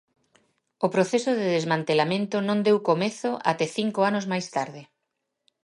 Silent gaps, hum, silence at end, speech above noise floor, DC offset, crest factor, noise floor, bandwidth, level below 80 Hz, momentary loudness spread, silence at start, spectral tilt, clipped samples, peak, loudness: none; none; 0.8 s; 56 dB; under 0.1%; 18 dB; -80 dBFS; 11.5 kHz; -74 dBFS; 6 LU; 0.8 s; -5.5 dB/octave; under 0.1%; -6 dBFS; -25 LUFS